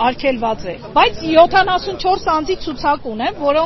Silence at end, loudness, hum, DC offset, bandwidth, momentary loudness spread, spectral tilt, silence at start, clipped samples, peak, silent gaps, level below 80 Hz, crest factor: 0 s; -16 LUFS; none; under 0.1%; 6.2 kHz; 10 LU; -2 dB/octave; 0 s; under 0.1%; 0 dBFS; none; -38 dBFS; 16 dB